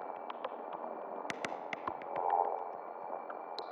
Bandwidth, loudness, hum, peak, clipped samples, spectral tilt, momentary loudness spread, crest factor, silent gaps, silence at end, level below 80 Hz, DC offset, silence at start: over 20 kHz; -40 LUFS; none; -18 dBFS; under 0.1%; -3.5 dB/octave; 10 LU; 22 dB; none; 0 s; -86 dBFS; under 0.1%; 0 s